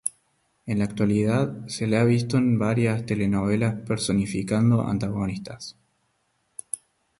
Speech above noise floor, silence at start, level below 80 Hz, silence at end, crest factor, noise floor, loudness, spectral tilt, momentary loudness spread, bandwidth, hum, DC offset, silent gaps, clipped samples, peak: 48 dB; 0.05 s; -52 dBFS; 0.45 s; 18 dB; -71 dBFS; -24 LUFS; -6.5 dB/octave; 14 LU; 11.5 kHz; none; under 0.1%; none; under 0.1%; -8 dBFS